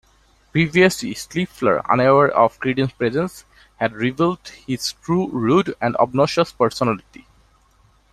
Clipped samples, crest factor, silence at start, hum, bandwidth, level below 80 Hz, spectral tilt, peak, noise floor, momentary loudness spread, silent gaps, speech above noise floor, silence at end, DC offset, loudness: under 0.1%; 18 dB; 0.55 s; none; 14 kHz; -52 dBFS; -5.5 dB/octave; -2 dBFS; -56 dBFS; 10 LU; none; 38 dB; 1.15 s; under 0.1%; -19 LUFS